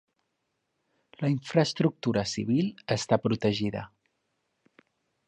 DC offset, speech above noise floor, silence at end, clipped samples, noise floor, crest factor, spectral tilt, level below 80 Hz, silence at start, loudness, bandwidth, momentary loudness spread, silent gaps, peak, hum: under 0.1%; 52 dB; 1.4 s; under 0.1%; -79 dBFS; 22 dB; -6 dB/octave; -62 dBFS; 1.2 s; -28 LUFS; 10 kHz; 7 LU; none; -8 dBFS; none